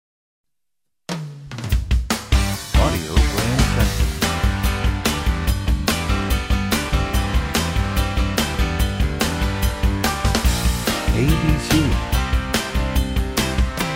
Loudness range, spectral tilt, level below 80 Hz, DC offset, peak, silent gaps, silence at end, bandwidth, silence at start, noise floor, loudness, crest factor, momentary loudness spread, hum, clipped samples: 1 LU; -4.5 dB/octave; -22 dBFS; under 0.1%; -2 dBFS; none; 0 s; 16.5 kHz; 1.1 s; -83 dBFS; -20 LUFS; 18 dB; 4 LU; none; under 0.1%